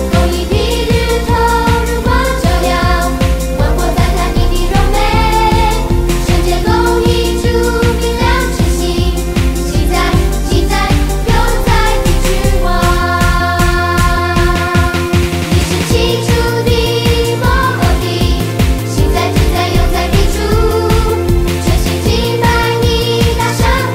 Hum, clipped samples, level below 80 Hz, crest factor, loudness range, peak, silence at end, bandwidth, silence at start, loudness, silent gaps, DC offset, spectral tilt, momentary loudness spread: none; under 0.1%; -16 dBFS; 10 dB; 1 LU; 0 dBFS; 0 s; 16.5 kHz; 0 s; -12 LUFS; none; under 0.1%; -5 dB/octave; 2 LU